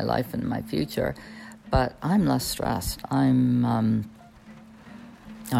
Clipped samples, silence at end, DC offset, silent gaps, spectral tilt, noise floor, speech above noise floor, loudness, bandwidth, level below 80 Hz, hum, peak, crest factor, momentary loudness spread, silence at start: under 0.1%; 0 s; under 0.1%; none; -6 dB/octave; -48 dBFS; 23 dB; -25 LUFS; 16 kHz; -42 dBFS; none; -10 dBFS; 16 dB; 22 LU; 0 s